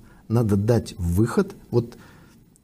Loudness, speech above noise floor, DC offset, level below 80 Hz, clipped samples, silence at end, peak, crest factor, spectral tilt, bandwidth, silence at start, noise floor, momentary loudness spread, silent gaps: -23 LUFS; 29 dB; under 0.1%; -44 dBFS; under 0.1%; 0.6 s; -6 dBFS; 16 dB; -8 dB/octave; 15.5 kHz; 0.3 s; -51 dBFS; 5 LU; none